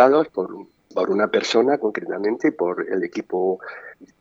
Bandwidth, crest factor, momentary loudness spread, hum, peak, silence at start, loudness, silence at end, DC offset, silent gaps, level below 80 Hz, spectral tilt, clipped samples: 7.8 kHz; 20 dB; 14 LU; none; 0 dBFS; 0 s; -22 LUFS; 0.15 s; under 0.1%; none; -70 dBFS; -5 dB/octave; under 0.1%